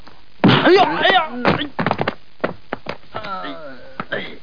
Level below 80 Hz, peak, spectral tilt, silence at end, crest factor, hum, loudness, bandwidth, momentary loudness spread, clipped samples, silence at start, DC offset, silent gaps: -52 dBFS; 0 dBFS; -7 dB/octave; 0.05 s; 18 dB; none; -17 LUFS; 5.2 kHz; 18 LU; under 0.1%; 0.45 s; 2%; none